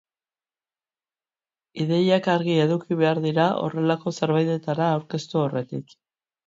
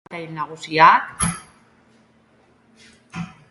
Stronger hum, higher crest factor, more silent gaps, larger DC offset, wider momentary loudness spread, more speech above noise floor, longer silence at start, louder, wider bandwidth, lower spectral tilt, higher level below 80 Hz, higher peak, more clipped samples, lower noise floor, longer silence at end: neither; about the same, 18 dB vs 22 dB; neither; neither; second, 9 LU vs 21 LU; first, over 68 dB vs 39 dB; first, 1.75 s vs 0.1 s; second, -23 LUFS vs -17 LUFS; second, 7.8 kHz vs 11.5 kHz; first, -7 dB/octave vs -3 dB/octave; second, -70 dBFS vs -48 dBFS; second, -6 dBFS vs 0 dBFS; neither; first, under -90 dBFS vs -57 dBFS; first, 0.65 s vs 0.25 s